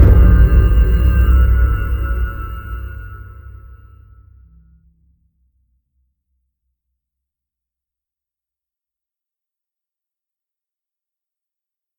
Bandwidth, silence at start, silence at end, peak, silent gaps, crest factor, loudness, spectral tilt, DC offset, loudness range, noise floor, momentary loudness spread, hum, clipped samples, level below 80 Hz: 19.5 kHz; 0 s; 8.5 s; 0 dBFS; none; 18 dB; -14 LUFS; -9.5 dB/octave; under 0.1%; 23 LU; -89 dBFS; 23 LU; none; under 0.1%; -18 dBFS